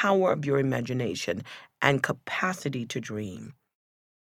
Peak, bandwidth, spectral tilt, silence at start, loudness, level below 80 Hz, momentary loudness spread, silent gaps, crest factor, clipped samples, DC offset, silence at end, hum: -4 dBFS; 16.5 kHz; -5.5 dB/octave; 0 s; -28 LUFS; -66 dBFS; 13 LU; none; 24 dB; under 0.1%; under 0.1%; 0.75 s; none